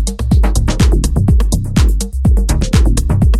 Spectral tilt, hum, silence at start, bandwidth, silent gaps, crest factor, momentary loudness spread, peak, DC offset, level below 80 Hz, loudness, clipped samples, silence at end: -6 dB/octave; none; 0 s; 13.5 kHz; none; 10 dB; 2 LU; 0 dBFS; under 0.1%; -12 dBFS; -14 LUFS; under 0.1%; 0 s